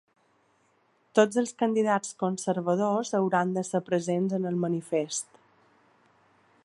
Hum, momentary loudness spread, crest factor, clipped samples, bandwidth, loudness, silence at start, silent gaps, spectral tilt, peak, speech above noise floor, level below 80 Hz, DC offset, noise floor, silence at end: none; 6 LU; 22 dB; under 0.1%; 11.5 kHz; -27 LUFS; 1.15 s; none; -5.5 dB/octave; -6 dBFS; 41 dB; -78 dBFS; under 0.1%; -68 dBFS; 1.4 s